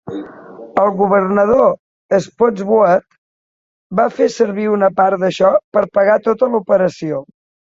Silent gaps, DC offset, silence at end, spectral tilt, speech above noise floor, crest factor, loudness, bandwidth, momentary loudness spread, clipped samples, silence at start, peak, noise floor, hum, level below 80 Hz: 1.79-2.09 s, 3.18-3.90 s, 5.64-5.72 s; under 0.1%; 0.5 s; -6.5 dB/octave; over 76 dB; 14 dB; -14 LUFS; 7.8 kHz; 10 LU; under 0.1%; 0.05 s; 0 dBFS; under -90 dBFS; none; -54 dBFS